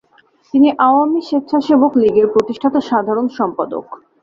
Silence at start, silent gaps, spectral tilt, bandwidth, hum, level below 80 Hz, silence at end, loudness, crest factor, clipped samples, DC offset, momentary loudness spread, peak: 0.55 s; none; -7 dB/octave; 7.2 kHz; none; -58 dBFS; 0.25 s; -15 LUFS; 14 dB; under 0.1%; under 0.1%; 8 LU; -2 dBFS